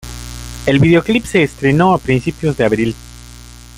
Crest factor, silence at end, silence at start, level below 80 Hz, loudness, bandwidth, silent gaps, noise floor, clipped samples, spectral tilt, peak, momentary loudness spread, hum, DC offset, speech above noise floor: 14 dB; 0.2 s; 0.05 s; -34 dBFS; -14 LUFS; 16 kHz; none; -36 dBFS; under 0.1%; -6.5 dB/octave; 0 dBFS; 18 LU; 60 Hz at -35 dBFS; under 0.1%; 23 dB